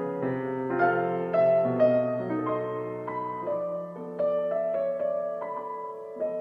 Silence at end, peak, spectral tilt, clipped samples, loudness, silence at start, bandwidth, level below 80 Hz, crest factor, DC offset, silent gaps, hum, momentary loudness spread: 0 s; -12 dBFS; -9.5 dB/octave; under 0.1%; -28 LUFS; 0 s; 5.4 kHz; -70 dBFS; 16 dB; under 0.1%; none; none; 11 LU